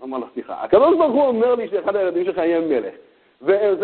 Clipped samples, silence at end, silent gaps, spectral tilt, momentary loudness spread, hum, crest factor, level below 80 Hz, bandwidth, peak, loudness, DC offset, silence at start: under 0.1%; 0 s; none; -10.5 dB/octave; 14 LU; none; 16 dB; -58 dBFS; 4.4 kHz; -2 dBFS; -19 LUFS; under 0.1%; 0 s